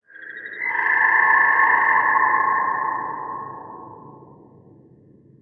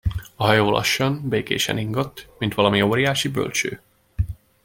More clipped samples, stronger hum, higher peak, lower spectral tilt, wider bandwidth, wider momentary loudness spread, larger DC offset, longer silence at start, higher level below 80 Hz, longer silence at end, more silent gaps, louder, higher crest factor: neither; neither; about the same, -4 dBFS vs -2 dBFS; first, -7 dB/octave vs -4.5 dB/octave; second, 4.5 kHz vs 17 kHz; first, 21 LU vs 11 LU; neither; about the same, 0.15 s vs 0.05 s; second, -72 dBFS vs -40 dBFS; first, 1.25 s vs 0.3 s; neither; first, -17 LUFS vs -21 LUFS; about the same, 16 dB vs 20 dB